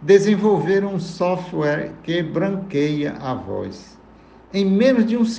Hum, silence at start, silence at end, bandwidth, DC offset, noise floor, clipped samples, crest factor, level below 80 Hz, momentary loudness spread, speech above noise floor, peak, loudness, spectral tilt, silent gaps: none; 0 s; 0 s; 8.8 kHz; under 0.1%; -46 dBFS; under 0.1%; 18 dB; -54 dBFS; 12 LU; 28 dB; -2 dBFS; -20 LUFS; -7 dB/octave; none